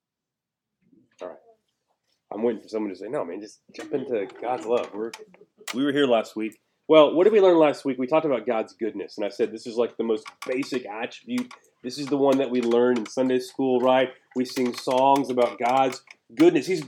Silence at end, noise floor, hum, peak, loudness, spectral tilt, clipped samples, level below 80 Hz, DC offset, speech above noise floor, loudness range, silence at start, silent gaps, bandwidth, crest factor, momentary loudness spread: 0 s; -87 dBFS; none; -2 dBFS; -24 LUFS; -5 dB/octave; under 0.1%; -82 dBFS; under 0.1%; 64 dB; 11 LU; 1.2 s; none; 17.5 kHz; 22 dB; 18 LU